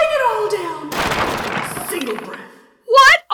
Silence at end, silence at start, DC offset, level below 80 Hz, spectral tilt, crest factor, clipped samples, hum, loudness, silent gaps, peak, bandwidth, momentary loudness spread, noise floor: 0 s; 0 s; under 0.1%; -46 dBFS; -2.5 dB/octave; 14 dB; under 0.1%; none; -16 LUFS; none; -4 dBFS; over 20 kHz; 17 LU; -41 dBFS